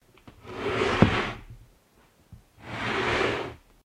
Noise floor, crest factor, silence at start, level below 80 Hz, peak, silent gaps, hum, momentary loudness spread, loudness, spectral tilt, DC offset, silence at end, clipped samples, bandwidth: -61 dBFS; 28 dB; 0.25 s; -46 dBFS; 0 dBFS; none; none; 19 LU; -26 LUFS; -6 dB/octave; under 0.1%; 0.3 s; under 0.1%; 14.5 kHz